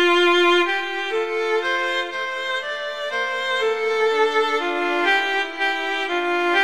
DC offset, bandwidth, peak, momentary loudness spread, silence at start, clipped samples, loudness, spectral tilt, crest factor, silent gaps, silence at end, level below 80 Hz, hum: 0.6%; 13.5 kHz; -6 dBFS; 9 LU; 0 s; under 0.1%; -20 LUFS; -1.5 dB/octave; 14 dB; none; 0 s; -68 dBFS; none